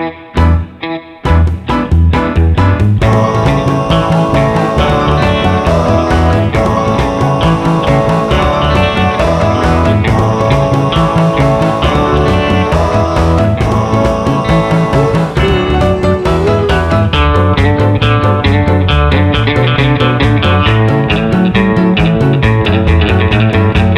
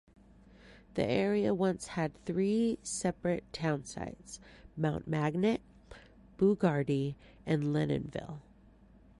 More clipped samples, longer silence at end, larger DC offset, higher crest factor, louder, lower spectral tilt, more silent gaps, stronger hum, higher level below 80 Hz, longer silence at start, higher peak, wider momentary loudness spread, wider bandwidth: neither; second, 0 s vs 0.8 s; neither; second, 10 dB vs 20 dB; first, -10 LUFS vs -33 LUFS; about the same, -7 dB/octave vs -6.5 dB/octave; neither; neither; first, -20 dBFS vs -58 dBFS; second, 0 s vs 0.65 s; first, 0 dBFS vs -14 dBFS; second, 2 LU vs 13 LU; about the same, 11.5 kHz vs 11.5 kHz